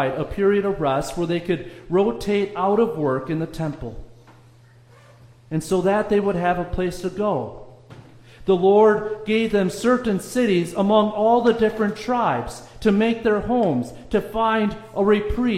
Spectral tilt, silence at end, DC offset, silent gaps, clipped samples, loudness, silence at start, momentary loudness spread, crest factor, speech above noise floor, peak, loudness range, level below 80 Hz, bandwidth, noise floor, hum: -6.5 dB/octave; 0 s; under 0.1%; none; under 0.1%; -21 LUFS; 0 s; 9 LU; 18 dB; 30 dB; -4 dBFS; 6 LU; -42 dBFS; 15.5 kHz; -50 dBFS; none